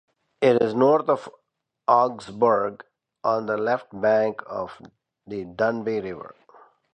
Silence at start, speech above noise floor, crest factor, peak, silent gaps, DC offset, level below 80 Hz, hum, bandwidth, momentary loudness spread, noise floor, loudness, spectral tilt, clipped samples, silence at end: 0.4 s; 51 dB; 20 dB; -4 dBFS; none; under 0.1%; -66 dBFS; none; 9.2 kHz; 15 LU; -74 dBFS; -23 LUFS; -7 dB/octave; under 0.1%; 0.65 s